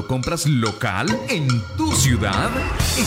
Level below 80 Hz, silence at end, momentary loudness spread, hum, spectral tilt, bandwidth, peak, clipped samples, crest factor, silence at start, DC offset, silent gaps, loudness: -32 dBFS; 0 s; 5 LU; none; -4.5 dB/octave; 16.5 kHz; -6 dBFS; under 0.1%; 14 dB; 0 s; under 0.1%; none; -20 LUFS